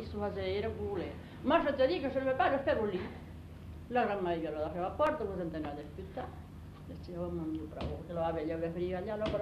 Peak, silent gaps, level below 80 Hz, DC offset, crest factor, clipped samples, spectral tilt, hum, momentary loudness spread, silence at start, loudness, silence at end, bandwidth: -16 dBFS; none; -52 dBFS; under 0.1%; 20 dB; under 0.1%; -7.5 dB/octave; 50 Hz at -60 dBFS; 17 LU; 0 s; -35 LUFS; 0 s; 13.5 kHz